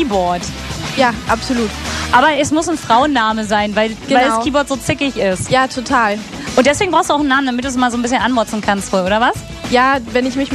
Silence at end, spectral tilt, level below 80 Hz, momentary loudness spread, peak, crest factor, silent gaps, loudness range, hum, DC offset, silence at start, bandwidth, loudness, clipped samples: 0 s; -4 dB/octave; -36 dBFS; 6 LU; 0 dBFS; 14 dB; none; 1 LU; none; under 0.1%; 0 s; 14 kHz; -15 LUFS; under 0.1%